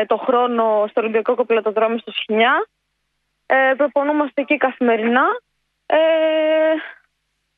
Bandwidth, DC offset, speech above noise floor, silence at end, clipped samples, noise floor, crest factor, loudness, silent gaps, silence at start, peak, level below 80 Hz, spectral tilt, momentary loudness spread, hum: 4.5 kHz; under 0.1%; 55 dB; 0.65 s; under 0.1%; -72 dBFS; 16 dB; -17 LUFS; none; 0 s; -2 dBFS; -72 dBFS; -7.5 dB/octave; 5 LU; none